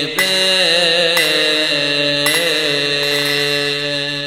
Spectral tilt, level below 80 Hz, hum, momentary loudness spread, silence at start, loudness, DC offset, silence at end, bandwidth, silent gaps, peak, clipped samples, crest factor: -2 dB/octave; -58 dBFS; none; 4 LU; 0 s; -13 LUFS; 0.2%; 0 s; 17 kHz; none; -2 dBFS; under 0.1%; 14 dB